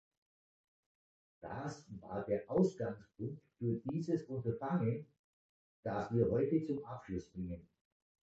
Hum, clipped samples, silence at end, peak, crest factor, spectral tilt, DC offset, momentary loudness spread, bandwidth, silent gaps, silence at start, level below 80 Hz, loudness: none; under 0.1%; 0.75 s; -20 dBFS; 20 dB; -9 dB/octave; under 0.1%; 12 LU; 8 kHz; 5.19-5.83 s; 1.4 s; -64 dBFS; -39 LUFS